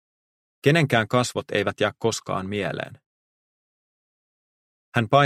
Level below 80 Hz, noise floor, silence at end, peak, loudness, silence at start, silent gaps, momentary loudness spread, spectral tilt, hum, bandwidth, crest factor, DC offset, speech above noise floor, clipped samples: -62 dBFS; under -90 dBFS; 0 s; -4 dBFS; -24 LUFS; 0.65 s; 3.06-4.92 s; 9 LU; -5 dB/octave; none; 15.5 kHz; 22 dB; under 0.1%; over 68 dB; under 0.1%